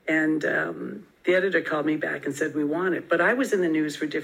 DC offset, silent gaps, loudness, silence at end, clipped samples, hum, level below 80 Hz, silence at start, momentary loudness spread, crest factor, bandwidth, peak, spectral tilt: under 0.1%; none; -25 LUFS; 0 s; under 0.1%; none; -74 dBFS; 0.05 s; 7 LU; 16 dB; 15.5 kHz; -8 dBFS; -5.5 dB/octave